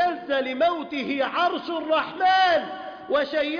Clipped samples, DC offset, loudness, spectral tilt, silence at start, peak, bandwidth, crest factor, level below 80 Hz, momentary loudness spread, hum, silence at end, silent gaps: under 0.1%; under 0.1%; -23 LUFS; -4 dB/octave; 0 s; -12 dBFS; 5.2 kHz; 12 dB; -64 dBFS; 9 LU; none; 0 s; none